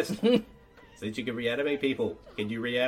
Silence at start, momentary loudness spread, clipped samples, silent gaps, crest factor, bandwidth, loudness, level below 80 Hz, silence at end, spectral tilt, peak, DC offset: 0 s; 11 LU; under 0.1%; none; 18 dB; 16 kHz; -30 LUFS; -60 dBFS; 0 s; -5.5 dB/octave; -10 dBFS; under 0.1%